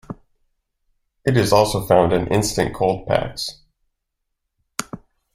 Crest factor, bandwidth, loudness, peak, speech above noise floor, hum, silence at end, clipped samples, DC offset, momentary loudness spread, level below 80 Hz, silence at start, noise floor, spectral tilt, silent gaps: 22 dB; 16 kHz; -19 LUFS; 0 dBFS; 59 dB; none; 0.4 s; under 0.1%; under 0.1%; 19 LU; -44 dBFS; 0.1 s; -77 dBFS; -5 dB/octave; none